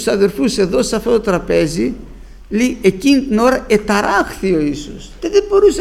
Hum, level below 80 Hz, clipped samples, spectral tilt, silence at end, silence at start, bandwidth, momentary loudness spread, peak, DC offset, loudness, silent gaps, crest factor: none; -34 dBFS; under 0.1%; -5 dB/octave; 0 s; 0 s; 15 kHz; 9 LU; 0 dBFS; under 0.1%; -15 LUFS; none; 14 dB